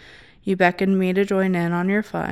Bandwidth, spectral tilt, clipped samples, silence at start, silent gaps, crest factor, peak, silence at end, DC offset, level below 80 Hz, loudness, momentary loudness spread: 12 kHz; -7.5 dB/octave; under 0.1%; 0.45 s; none; 18 dB; -4 dBFS; 0 s; 0.1%; -56 dBFS; -20 LUFS; 5 LU